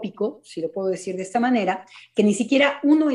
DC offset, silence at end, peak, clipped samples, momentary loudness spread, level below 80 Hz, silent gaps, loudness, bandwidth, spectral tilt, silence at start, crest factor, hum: under 0.1%; 0 s; -4 dBFS; under 0.1%; 11 LU; -70 dBFS; none; -22 LUFS; 11 kHz; -5 dB/octave; 0 s; 16 dB; none